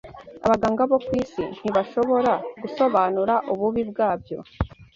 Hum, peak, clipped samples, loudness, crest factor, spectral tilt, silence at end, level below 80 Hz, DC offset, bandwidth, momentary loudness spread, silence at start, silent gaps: none; -6 dBFS; under 0.1%; -23 LUFS; 18 dB; -7.5 dB/octave; 0.1 s; -46 dBFS; under 0.1%; 7.6 kHz; 11 LU; 0.05 s; none